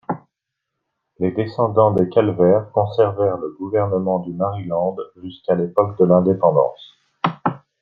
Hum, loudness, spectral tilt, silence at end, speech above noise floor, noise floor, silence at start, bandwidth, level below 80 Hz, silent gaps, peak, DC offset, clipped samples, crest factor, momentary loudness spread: none; -19 LUFS; -10.5 dB/octave; 0.25 s; 62 dB; -80 dBFS; 0.1 s; 5.8 kHz; -60 dBFS; none; -2 dBFS; under 0.1%; under 0.1%; 18 dB; 10 LU